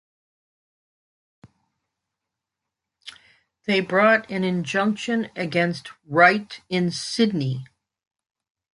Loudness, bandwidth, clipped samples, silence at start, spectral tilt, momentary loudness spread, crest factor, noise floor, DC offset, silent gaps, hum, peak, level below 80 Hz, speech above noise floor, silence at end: -22 LUFS; 11.5 kHz; under 0.1%; 3.05 s; -5.5 dB/octave; 17 LU; 22 dB; -85 dBFS; under 0.1%; none; none; -2 dBFS; -68 dBFS; 63 dB; 1.1 s